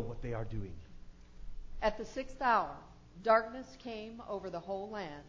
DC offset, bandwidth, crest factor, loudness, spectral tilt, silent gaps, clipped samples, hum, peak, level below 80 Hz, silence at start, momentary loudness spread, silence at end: under 0.1%; 8 kHz; 22 dB; -36 LUFS; -6 dB/octave; none; under 0.1%; 60 Hz at -65 dBFS; -14 dBFS; -52 dBFS; 0 s; 23 LU; 0 s